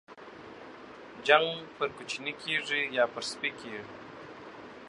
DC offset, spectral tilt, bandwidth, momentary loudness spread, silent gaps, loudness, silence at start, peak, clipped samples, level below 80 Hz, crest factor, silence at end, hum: under 0.1%; -2.5 dB/octave; 11 kHz; 23 LU; none; -30 LUFS; 0.1 s; -6 dBFS; under 0.1%; -72 dBFS; 28 dB; 0 s; none